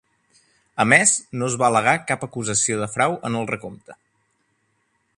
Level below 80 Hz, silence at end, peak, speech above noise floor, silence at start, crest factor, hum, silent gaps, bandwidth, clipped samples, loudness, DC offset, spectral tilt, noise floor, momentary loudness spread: -60 dBFS; 1.25 s; 0 dBFS; 48 dB; 0.75 s; 22 dB; none; none; 11.5 kHz; under 0.1%; -20 LUFS; under 0.1%; -3 dB/octave; -69 dBFS; 13 LU